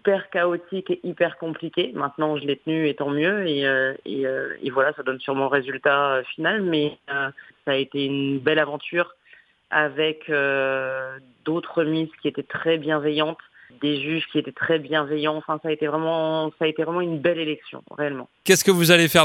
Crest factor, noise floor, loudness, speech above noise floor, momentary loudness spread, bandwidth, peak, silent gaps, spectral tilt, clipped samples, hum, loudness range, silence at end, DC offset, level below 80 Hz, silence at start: 22 dB; -55 dBFS; -23 LUFS; 32 dB; 8 LU; 16 kHz; 0 dBFS; none; -4 dB/octave; under 0.1%; none; 2 LU; 0 s; under 0.1%; -68 dBFS; 0.05 s